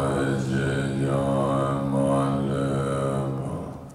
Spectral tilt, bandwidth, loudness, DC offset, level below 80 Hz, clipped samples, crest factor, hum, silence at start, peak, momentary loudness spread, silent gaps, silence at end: -7 dB/octave; 12 kHz; -25 LUFS; under 0.1%; -46 dBFS; under 0.1%; 12 dB; none; 0 s; -12 dBFS; 6 LU; none; 0 s